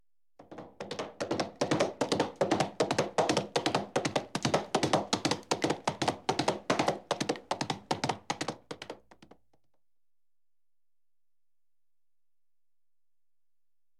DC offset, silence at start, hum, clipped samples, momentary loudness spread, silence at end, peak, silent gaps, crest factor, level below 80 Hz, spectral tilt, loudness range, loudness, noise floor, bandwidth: under 0.1%; 0.4 s; none; under 0.1%; 13 LU; 5.05 s; -12 dBFS; none; 22 dB; -70 dBFS; -4 dB/octave; 9 LU; -32 LUFS; under -90 dBFS; 15 kHz